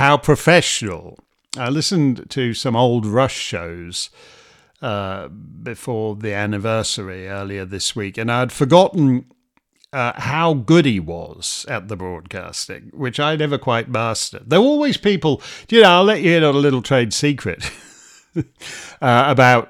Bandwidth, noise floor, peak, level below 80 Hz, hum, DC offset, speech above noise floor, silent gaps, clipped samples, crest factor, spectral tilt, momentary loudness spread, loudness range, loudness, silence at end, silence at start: 15 kHz; -58 dBFS; 0 dBFS; -52 dBFS; none; under 0.1%; 41 dB; none; under 0.1%; 18 dB; -5 dB/octave; 16 LU; 9 LU; -17 LUFS; 0.05 s; 0 s